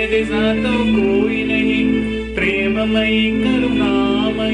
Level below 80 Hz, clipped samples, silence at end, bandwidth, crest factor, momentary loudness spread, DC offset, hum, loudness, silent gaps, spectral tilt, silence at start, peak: -34 dBFS; under 0.1%; 0 s; 10 kHz; 10 dB; 2 LU; under 0.1%; none; -16 LUFS; none; -6.5 dB/octave; 0 s; -6 dBFS